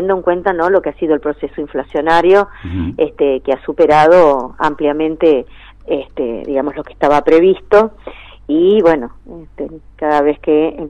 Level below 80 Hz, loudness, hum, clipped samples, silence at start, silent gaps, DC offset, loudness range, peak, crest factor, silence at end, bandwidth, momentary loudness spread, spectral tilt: -40 dBFS; -13 LUFS; none; under 0.1%; 0 s; none; under 0.1%; 2 LU; -2 dBFS; 12 dB; 0 s; 9.2 kHz; 13 LU; -7 dB/octave